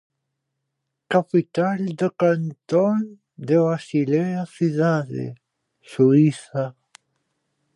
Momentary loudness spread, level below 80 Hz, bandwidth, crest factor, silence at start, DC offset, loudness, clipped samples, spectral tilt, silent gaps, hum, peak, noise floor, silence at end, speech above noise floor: 13 LU; -72 dBFS; 11 kHz; 18 dB; 1.1 s; under 0.1%; -21 LUFS; under 0.1%; -8 dB/octave; none; none; -4 dBFS; -79 dBFS; 1.05 s; 59 dB